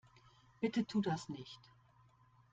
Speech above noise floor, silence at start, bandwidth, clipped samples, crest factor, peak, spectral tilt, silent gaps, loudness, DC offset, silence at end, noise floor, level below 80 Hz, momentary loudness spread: 29 dB; 0.6 s; 8.8 kHz; under 0.1%; 20 dB; -24 dBFS; -6 dB/octave; none; -39 LUFS; under 0.1%; 0.95 s; -68 dBFS; -76 dBFS; 17 LU